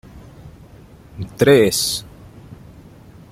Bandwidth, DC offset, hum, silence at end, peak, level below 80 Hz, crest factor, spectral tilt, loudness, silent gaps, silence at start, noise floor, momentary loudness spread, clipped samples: 16 kHz; under 0.1%; none; 0.8 s; -2 dBFS; -46 dBFS; 20 dB; -4 dB/octave; -15 LUFS; none; 0.15 s; -43 dBFS; 21 LU; under 0.1%